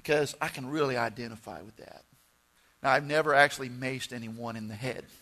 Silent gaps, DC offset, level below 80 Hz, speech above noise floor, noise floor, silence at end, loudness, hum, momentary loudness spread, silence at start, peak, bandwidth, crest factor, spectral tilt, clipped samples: none; under 0.1%; -66 dBFS; 36 dB; -67 dBFS; 0.05 s; -29 LUFS; none; 18 LU; 0.05 s; -6 dBFS; 13.5 kHz; 24 dB; -4.5 dB/octave; under 0.1%